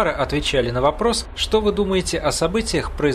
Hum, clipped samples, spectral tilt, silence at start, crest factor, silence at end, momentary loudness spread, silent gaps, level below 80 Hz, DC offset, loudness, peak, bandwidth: none; under 0.1%; -4 dB/octave; 0 s; 16 dB; 0 s; 3 LU; none; -32 dBFS; under 0.1%; -20 LUFS; -4 dBFS; 14 kHz